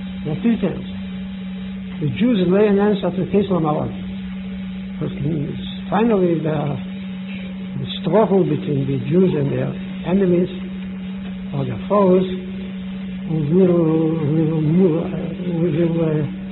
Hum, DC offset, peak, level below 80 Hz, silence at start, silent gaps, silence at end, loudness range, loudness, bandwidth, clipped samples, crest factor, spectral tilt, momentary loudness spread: none; under 0.1%; -4 dBFS; -44 dBFS; 0 s; none; 0 s; 4 LU; -20 LUFS; 4.1 kHz; under 0.1%; 16 dB; -13 dB/octave; 13 LU